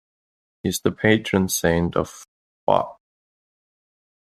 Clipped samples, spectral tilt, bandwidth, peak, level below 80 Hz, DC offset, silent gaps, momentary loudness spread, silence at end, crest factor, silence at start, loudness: under 0.1%; -4.5 dB/octave; 14.5 kHz; -2 dBFS; -52 dBFS; under 0.1%; 2.28-2.67 s; 11 LU; 1.3 s; 22 dB; 0.65 s; -22 LUFS